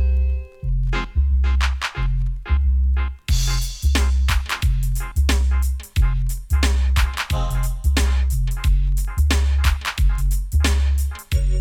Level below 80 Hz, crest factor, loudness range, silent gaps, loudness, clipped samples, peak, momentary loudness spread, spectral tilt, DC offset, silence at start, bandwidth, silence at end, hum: -18 dBFS; 12 dB; 1 LU; none; -21 LUFS; under 0.1%; -6 dBFS; 5 LU; -4.5 dB/octave; under 0.1%; 0 s; 16 kHz; 0 s; none